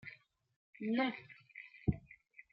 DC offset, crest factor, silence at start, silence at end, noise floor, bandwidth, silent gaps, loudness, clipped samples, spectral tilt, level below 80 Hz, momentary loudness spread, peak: under 0.1%; 24 dB; 0.05 s; 0.1 s; -62 dBFS; 5.6 kHz; 0.56-0.73 s; -39 LUFS; under 0.1%; -5.5 dB/octave; -58 dBFS; 22 LU; -18 dBFS